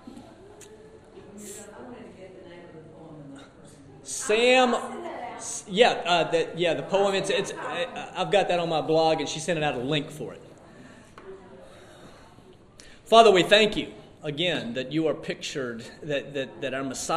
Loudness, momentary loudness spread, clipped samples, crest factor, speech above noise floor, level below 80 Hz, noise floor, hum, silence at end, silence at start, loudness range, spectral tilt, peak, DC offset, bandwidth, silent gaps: -24 LUFS; 26 LU; under 0.1%; 26 dB; 27 dB; -58 dBFS; -51 dBFS; none; 0 s; 0.05 s; 18 LU; -3.5 dB/octave; -2 dBFS; under 0.1%; 15 kHz; none